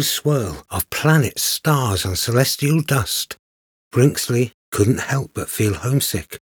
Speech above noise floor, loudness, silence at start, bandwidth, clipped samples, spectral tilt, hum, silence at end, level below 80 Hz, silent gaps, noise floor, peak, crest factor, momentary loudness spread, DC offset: over 71 dB; -19 LUFS; 0 s; over 20 kHz; under 0.1%; -4.5 dB/octave; none; 0.2 s; -48 dBFS; 3.39-3.91 s, 4.54-4.72 s; under -90 dBFS; 0 dBFS; 18 dB; 8 LU; under 0.1%